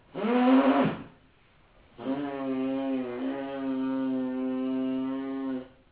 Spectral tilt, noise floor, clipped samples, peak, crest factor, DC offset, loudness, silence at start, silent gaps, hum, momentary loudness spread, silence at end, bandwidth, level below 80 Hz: -5 dB/octave; -61 dBFS; under 0.1%; -12 dBFS; 18 dB; under 0.1%; -29 LUFS; 0.15 s; none; none; 12 LU; 0.25 s; 4 kHz; -66 dBFS